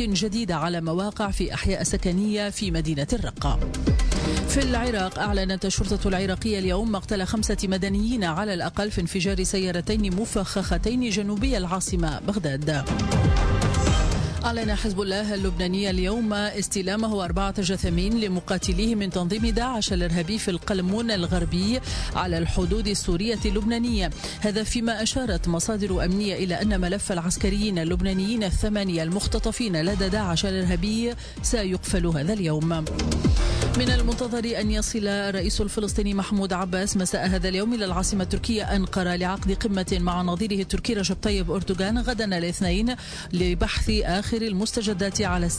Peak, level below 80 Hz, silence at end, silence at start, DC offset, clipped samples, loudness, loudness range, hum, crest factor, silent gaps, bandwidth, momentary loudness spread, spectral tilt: -10 dBFS; -30 dBFS; 0 s; 0 s; under 0.1%; under 0.1%; -25 LUFS; 1 LU; none; 14 dB; none; 11 kHz; 3 LU; -5 dB/octave